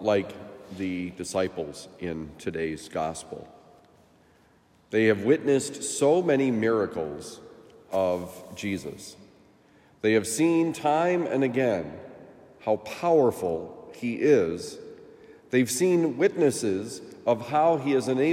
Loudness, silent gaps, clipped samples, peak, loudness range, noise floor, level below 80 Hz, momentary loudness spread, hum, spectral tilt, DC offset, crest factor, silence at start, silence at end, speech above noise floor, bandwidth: -26 LUFS; none; under 0.1%; -8 dBFS; 8 LU; -60 dBFS; -66 dBFS; 17 LU; none; -5 dB/octave; under 0.1%; 18 dB; 0 s; 0 s; 35 dB; 16 kHz